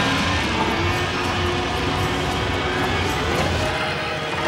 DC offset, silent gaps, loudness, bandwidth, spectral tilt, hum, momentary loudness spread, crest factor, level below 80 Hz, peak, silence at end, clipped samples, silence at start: under 0.1%; none; -21 LUFS; 16.5 kHz; -4.5 dB/octave; none; 2 LU; 14 dB; -34 dBFS; -8 dBFS; 0 s; under 0.1%; 0 s